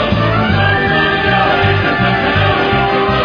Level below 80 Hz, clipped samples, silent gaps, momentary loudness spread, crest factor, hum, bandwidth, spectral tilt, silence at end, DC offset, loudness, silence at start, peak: -30 dBFS; under 0.1%; none; 1 LU; 12 dB; none; 5.2 kHz; -7.5 dB/octave; 0 s; under 0.1%; -12 LUFS; 0 s; 0 dBFS